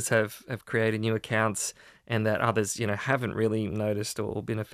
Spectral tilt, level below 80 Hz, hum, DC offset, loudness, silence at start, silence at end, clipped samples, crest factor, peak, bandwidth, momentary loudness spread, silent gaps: -5 dB/octave; -62 dBFS; none; under 0.1%; -29 LUFS; 0 s; 0 s; under 0.1%; 18 dB; -10 dBFS; 15.5 kHz; 7 LU; none